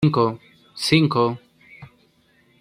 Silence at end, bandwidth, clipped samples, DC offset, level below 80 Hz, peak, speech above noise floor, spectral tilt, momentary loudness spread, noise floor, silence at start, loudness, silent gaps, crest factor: 0.75 s; 14 kHz; under 0.1%; under 0.1%; -56 dBFS; -2 dBFS; 40 dB; -6 dB/octave; 21 LU; -60 dBFS; 0 s; -20 LUFS; none; 20 dB